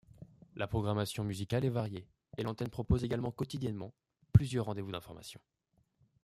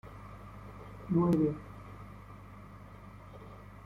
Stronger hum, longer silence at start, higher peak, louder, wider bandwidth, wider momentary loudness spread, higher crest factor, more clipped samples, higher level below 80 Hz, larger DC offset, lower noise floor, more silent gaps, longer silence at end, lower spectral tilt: second, none vs 50 Hz at -50 dBFS; first, 0.2 s vs 0.05 s; first, -10 dBFS vs -18 dBFS; second, -35 LUFS vs -31 LUFS; first, 14.5 kHz vs 11.5 kHz; second, 19 LU vs 22 LU; first, 26 dB vs 18 dB; neither; about the same, -52 dBFS vs -56 dBFS; neither; first, -73 dBFS vs -50 dBFS; neither; first, 0.85 s vs 0.05 s; second, -7 dB/octave vs -9.5 dB/octave